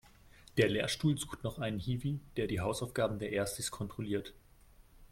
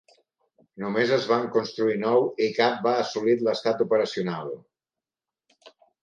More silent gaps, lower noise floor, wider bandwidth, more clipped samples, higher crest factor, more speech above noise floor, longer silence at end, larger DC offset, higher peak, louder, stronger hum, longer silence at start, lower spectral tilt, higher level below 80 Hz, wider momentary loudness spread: neither; second, -61 dBFS vs under -90 dBFS; first, 16.5 kHz vs 7.4 kHz; neither; about the same, 22 dB vs 20 dB; second, 26 dB vs over 66 dB; second, 0.05 s vs 0.35 s; neither; second, -14 dBFS vs -6 dBFS; second, -35 LUFS vs -24 LUFS; neither; second, 0.4 s vs 0.75 s; about the same, -5 dB/octave vs -5.5 dB/octave; first, -56 dBFS vs -76 dBFS; about the same, 8 LU vs 8 LU